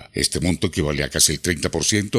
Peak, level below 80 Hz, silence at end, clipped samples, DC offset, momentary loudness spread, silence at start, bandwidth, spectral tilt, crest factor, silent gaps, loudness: -2 dBFS; -40 dBFS; 0 s; under 0.1%; under 0.1%; 6 LU; 0 s; 16 kHz; -3 dB/octave; 18 dB; none; -20 LUFS